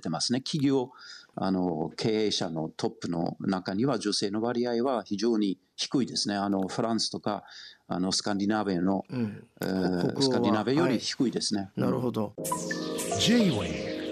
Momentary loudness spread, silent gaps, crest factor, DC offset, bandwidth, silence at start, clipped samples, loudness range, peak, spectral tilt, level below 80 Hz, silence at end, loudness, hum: 8 LU; none; 18 dB; under 0.1%; 13.5 kHz; 0 s; under 0.1%; 2 LU; -10 dBFS; -4.5 dB/octave; -66 dBFS; 0 s; -29 LUFS; none